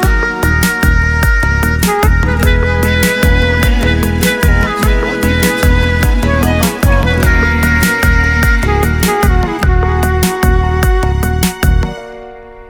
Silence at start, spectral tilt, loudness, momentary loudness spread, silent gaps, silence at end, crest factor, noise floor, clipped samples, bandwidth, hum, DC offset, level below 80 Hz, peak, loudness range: 0 s; -5 dB/octave; -12 LUFS; 3 LU; none; 0 s; 10 dB; -31 dBFS; under 0.1%; over 20 kHz; none; under 0.1%; -14 dBFS; 0 dBFS; 1 LU